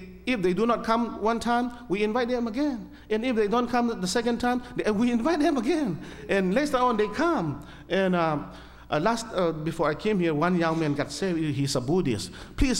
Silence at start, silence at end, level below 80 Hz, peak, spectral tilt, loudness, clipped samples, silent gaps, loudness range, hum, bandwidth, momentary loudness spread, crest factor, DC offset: 0 s; 0 s; -44 dBFS; -8 dBFS; -5.5 dB/octave; -26 LUFS; under 0.1%; none; 1 LU; none; 16 kHz; 6 LU; 16 dB; under 0.1%